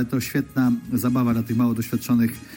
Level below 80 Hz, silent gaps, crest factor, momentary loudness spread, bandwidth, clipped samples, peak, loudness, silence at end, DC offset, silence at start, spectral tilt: -52 dBFS; none; 12 dB; 3 LU; 17 kHz; under 0.1%; -10 dBFS; -22 LUFS; 0 s; under 0.1%; 0 s; -6.5 dB/octave